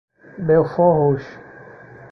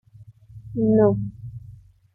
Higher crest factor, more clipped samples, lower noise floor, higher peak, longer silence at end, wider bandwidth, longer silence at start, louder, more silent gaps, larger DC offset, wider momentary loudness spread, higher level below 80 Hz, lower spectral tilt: about the same, 16 dB vs 18 dB; neither; second, -41 dBFS vs -48 dBFS; about the same, -4 dBFS vs -6 dBFS; about the same, 0.5 s vs 0.45 s; first, 6 kHz vs 1.8 kHz; first, 0.35 s vs 0.2 s; first, -18 LUFS vs -21 LUFS; neither; neither; second, 12 LU vs 21 LU; about the same, -52 dBFS vs -50 dBFS; second, -10.5 dB/octave vs -13.5 dB/octave